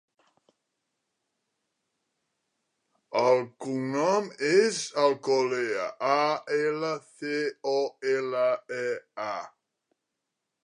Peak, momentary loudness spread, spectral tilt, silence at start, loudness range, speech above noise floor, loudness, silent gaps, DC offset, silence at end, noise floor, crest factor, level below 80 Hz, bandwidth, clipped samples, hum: -10 dBFS; 10 LU; -4 dB/octave; 3.1 s; 6 LU; 57 dB; -27 LUFS; none; under 0.1%; 1.15 s; -84 dBFS; 20 dB; -84 dBFS; 11 kHz; under 0.1%; none